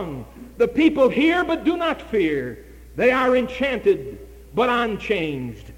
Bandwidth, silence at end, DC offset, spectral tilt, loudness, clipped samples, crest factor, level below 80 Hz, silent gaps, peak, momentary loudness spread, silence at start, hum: 16 kHz; 0 s; under 0.1%; -6 dB/octave; -21 LUFS; under 0.1%; 16 dB; -44 dBFS; none; -6 dBFS; 18 LU; 0 s; none